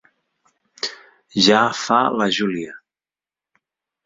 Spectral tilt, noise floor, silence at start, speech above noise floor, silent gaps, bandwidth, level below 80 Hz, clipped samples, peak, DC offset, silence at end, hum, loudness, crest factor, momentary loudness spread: -3.5 dB/octave; under -90 dBFS; 0.85 s; over 72 dB; none; 7.8 kHz; -62 dBFS; under 0.1%; -2 dBFS; under 0.1%; 1.3 s; none; -19 LUFS; 20 dB; 14 LU